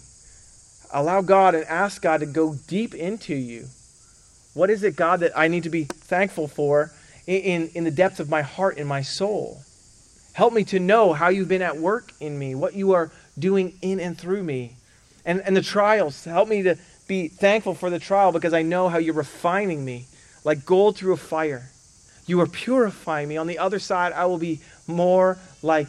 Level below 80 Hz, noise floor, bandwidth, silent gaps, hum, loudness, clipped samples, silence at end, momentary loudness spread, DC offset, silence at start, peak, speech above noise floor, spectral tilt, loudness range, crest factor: -60 dBFS; -53 dBFS; 12.5 kHz; none; none; -22 LUFS; under 0.1%; 0 s; 11 LU; under 0.1%; 0.9 s; -4 dBFS; 31 dB; -6 dB/octave; 3 LU; 18 dB